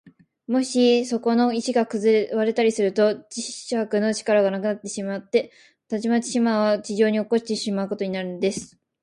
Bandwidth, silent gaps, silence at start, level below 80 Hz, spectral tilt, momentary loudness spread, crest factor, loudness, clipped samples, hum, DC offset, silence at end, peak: 11.5 kHz; none; 0.5 s; -68 dBFS; -4.5 dB/octave; 9 LU; 16 dB; -23 LUFS; under 0.1%; none; under 0.1%; 0.35 s; -6 dBFS